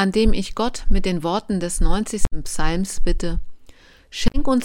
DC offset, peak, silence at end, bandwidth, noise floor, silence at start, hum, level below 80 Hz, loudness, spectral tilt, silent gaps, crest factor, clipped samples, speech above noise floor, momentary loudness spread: under 0.1%; -4 dBFS; 0 s; 12 kHz; -46 dBFS; 0 s; none; -22 dBFS; -24 LUFS; -5 dB/octave; none; 14 dB; under 0.1%; 29 dB; 7 LU